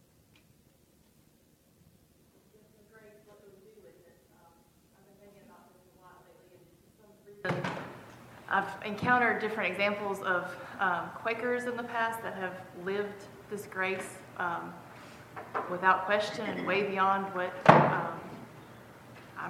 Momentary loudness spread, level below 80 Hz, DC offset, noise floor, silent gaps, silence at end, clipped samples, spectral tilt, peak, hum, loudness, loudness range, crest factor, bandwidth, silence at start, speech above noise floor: 22 LU; -72 dBFS; under 0.1%; -65 dBFS; none; 0 s; under 0.1%; -5.5 dB/octave; 0 dBFS; none; -30 LUFS; 11 LU; 34 dB; 16.5 kHz; 2.95 s; 35 dB